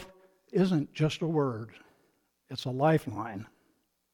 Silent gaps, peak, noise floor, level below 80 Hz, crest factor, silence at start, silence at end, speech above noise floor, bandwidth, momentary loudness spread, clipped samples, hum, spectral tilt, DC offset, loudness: none; -14 dBFS; -73 dBFS; -66 dBFS; 18 dB; 0 s; 0.65 s; 44 dB; 16.5 kHz; 15 LU; under 0.1%; none; -7 dB/octave; under 0.1%; -30 LUFS